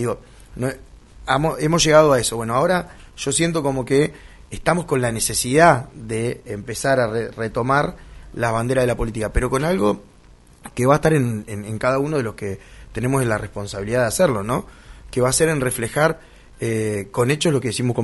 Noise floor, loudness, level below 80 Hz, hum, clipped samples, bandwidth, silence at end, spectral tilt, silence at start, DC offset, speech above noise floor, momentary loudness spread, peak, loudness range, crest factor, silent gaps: -48 dBFS; -20 LUFS; -38 dBFS; none; under 0.1%; 12 kHz; 0 s; -4.5 dB/octave; 0 s; under 0.1%; 28 dB; 13 LU; 0 dBFS; 4 LU; 20 dB; none